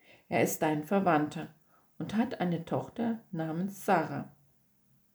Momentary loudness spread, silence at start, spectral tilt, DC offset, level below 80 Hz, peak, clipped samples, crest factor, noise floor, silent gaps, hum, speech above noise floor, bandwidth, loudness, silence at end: 13 LU; 0.3 s; -6 dB/octave; under 0.1%; -72 dBFS; -14 dBFS; under 0.1%; 18 dB; -68 dBFS; none; none; 37 dB; over 20 kHz; -32 LUFS; 0.85 s